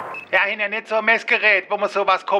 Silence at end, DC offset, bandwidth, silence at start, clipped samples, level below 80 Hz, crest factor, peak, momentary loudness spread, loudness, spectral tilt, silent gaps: 0 s; under 0.1%; 11 kHz; 0 s; under 0.1%; -66 dBFS; 16 dB; -4 dBFS; 6 LU; -18 LUFS; -3 dB/octave; none